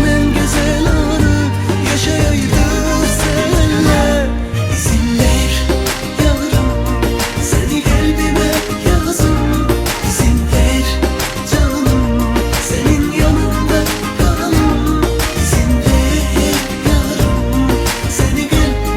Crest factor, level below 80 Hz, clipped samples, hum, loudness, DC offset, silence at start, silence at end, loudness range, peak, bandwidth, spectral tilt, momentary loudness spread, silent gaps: 12 dB; -18 dBFS; under 0.1%; none; -14 LUFS; under 0.1%; 0 s; 0 s; 1 LU; 0 dBFS; 17 kHz; -5 dB/octave; 3 LU; none